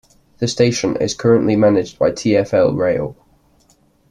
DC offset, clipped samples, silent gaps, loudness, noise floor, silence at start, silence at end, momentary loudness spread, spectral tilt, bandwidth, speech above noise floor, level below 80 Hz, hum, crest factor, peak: under 0.1%; under 0.1%; none; -16 LUFS; -55 dBFS; 0.4 s; 1 s; 9 LU; -5.5 dB/octave; 11 kHz; 40 dB; -50 dBFS; none; 16 dB; -2 dBFS